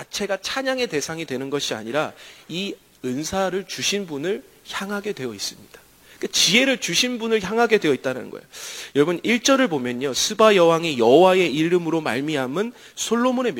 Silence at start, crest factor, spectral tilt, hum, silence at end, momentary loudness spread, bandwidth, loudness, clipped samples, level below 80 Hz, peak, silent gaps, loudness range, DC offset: 0 s; 20 dB; -3.5 dB/octave; none; 0 s; 15 LU; 16.5 kHz; -21 LUFS; under 0.1%; -60 dBFS; -2 dBFS; none; 9 LU; under 0.1%